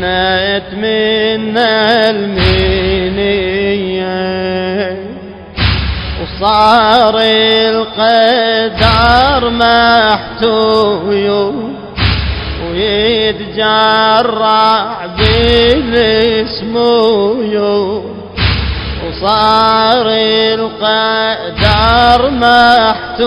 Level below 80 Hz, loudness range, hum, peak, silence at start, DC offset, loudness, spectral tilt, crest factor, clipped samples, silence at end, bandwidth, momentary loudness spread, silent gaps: -26 dBFS; 4 LU; none; 0 dBFS; 0 s; under 0.1%; -10 LUFS; -6.5 dB/octave; 10 dB; 0.3%; 0 s; 12 kHz; 9 LU; none